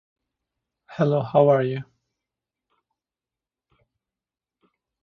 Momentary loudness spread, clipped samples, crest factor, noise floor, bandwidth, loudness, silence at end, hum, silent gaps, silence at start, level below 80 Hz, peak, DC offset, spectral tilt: 15 LU; under 0.1%; 22 dB; under -90 dBFS; 6.4 kHz; -21 LUFS; 3.2 s; none; none; 0.9 s; -68 dBFS; -4 dBFS; under 0.1%; -9.5 dB/octave